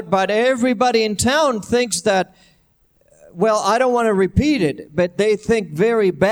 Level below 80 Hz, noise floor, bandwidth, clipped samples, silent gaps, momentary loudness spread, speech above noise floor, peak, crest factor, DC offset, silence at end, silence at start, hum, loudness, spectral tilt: -42 dBFS; -59 dBFS; 16 kHz; under 0.1%; none; 5 LU; 42 dB; -2 dBFS; 16 dB; under 0.1%; 0 s; 0 s; none; -17 LUFS; -4.5 dB/octave